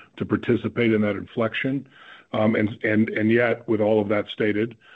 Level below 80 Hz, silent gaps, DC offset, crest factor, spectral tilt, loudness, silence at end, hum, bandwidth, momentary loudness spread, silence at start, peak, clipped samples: -62 dBFS; none; under 0.1%; 16 dB; -9 dB/octave; -23 LUFS; 0.25 s; none; 4.7 kHz; 6 LU; 0.15 s; -8 dBFS; under 0.1%